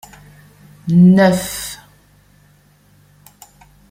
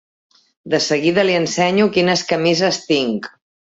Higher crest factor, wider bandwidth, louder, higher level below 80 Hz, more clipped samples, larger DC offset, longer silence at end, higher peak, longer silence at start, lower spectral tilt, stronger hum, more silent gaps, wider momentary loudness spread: about the same, 16 dB vs 14 dB; first, 16 kHz vs 8 kHz; first, -13 LUFS vs -17 LUFS; first, -50 dBFS vs -60 dBFS; neither; neither; first, 2.15 s vs 0.5 s; about the same, -2 dBFS vs -2 dBFS; first, 0.85 s vs 0.65 s; first, -6.5 dB/octave vs -4 dB/octave; first, 50 Hz at -50 dBFS vs none; neither; first, 21 LU vs 7 LU